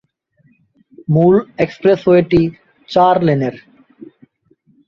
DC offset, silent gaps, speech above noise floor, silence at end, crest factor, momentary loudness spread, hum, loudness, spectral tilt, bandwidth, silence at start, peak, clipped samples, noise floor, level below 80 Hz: under 0.1%; none; 44 dB; 0.85 s; 14 dB; 9 LU; none; -14 LUFS; -9 dB/octave; 6.8 kHz; 1.1 s; -2 dBFS; under 0.1%; -57 dBFS; -46 dBFS